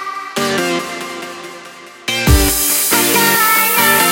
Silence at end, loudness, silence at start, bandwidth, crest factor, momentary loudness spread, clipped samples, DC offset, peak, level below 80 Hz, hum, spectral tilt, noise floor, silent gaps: 0 s; -12 LUFS; 0 s; 17 kHz; 14 dB; 17 LU; under 0.1%; under 0.1%; 0 dBFS; -24 dBFS; none; -2.5 dB/octave; -35 dBFS; none